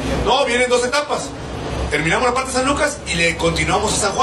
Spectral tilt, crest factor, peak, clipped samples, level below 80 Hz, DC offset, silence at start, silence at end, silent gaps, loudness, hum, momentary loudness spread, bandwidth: -3.5 dB/octave; 14 dB; -4 dBFS; under 0.1%; -32 dBFS; under 0.1%; 0 s; 0 s; none; -18 LUFS; none; 8 LU; 13 kHz